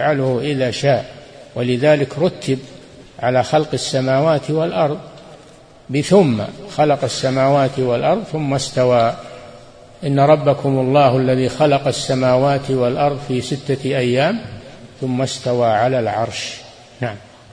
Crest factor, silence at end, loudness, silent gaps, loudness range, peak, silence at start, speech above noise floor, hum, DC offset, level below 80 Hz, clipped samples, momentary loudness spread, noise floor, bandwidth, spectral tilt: 18 dB; 0.3 s; -17 LUFS; none; 4 LU; 0 dBFS; 0 s; 27 dB; none; under 0.1%; -50 dBFS; under 0.1%; 13 LU; -43 dBFS; 10.5 kHz; -6 dB/octave